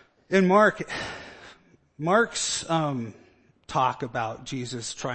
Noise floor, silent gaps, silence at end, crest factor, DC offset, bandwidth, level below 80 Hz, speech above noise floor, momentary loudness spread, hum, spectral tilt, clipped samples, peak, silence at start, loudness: -55 dBFS; none; 0 s; 20 dB; under 0.1%; 8.8 kHz; -60 dBFS; 30 dB; 14 LU; none; -4.5 dB/octave; under 0.1%; -6 dBFS; 0.3 s; -25 LUFS